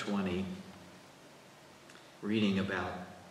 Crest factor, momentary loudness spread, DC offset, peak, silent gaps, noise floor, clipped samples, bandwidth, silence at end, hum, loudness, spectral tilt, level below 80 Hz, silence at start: 18 dB; 24 LU; under 0.1%; -20 dBFS; none; -57 dBFS; under 0.1%; 13 kHz; 0 s; none; -35 LUFS; -6 dB/octave; -70 dBFS; 0 s